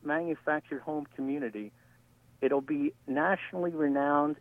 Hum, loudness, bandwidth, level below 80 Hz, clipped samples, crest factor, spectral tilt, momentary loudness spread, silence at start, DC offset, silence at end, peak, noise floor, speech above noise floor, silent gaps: none; -31 LUFS; 3.8 kHz; -74 dBFS; under 0.1%; 18 dB; -8 dB/octave; 9 LU; 0.05 s; under 0.1%; 0.05 s; -12 dBFS; -62 dBFS; 31 dB; none